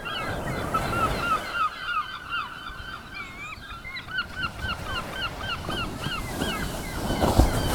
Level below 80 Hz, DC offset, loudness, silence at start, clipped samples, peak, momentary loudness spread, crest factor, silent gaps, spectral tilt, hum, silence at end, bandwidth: -36 dBFS; under 0.1%; -29 LUFS; 0 s; under 0.1%; -2 dBFS; 12 LU; 26 dB; none; -4.5 dB/octave; none; 0 s; over 20 kHz